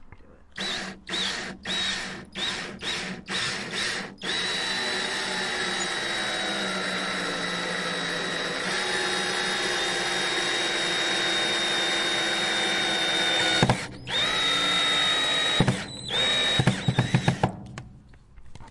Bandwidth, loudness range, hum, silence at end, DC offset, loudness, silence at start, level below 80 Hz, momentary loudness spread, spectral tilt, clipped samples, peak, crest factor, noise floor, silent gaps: 11.5 kHz; 6 LU; none; 0 s; under 0.1%; -25 LUFS; 0 s; -52 dBFS; 9 LU; -3 dB/octave; under 0.1%; -4 dBFS; 22 dB; -49 dBFS; none